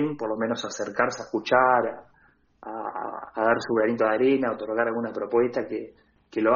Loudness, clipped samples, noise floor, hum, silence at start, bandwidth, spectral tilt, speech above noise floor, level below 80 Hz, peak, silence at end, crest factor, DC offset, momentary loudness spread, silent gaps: -25 LUFS; under 0.1%; -61 dBFS; none; 0 s; 7.2 kHz; -3.5 dB/octave; 36 dB; -66 dBFS; -6 dBFS; 0 s; 20 dB; under 0.1%; 13 LU; none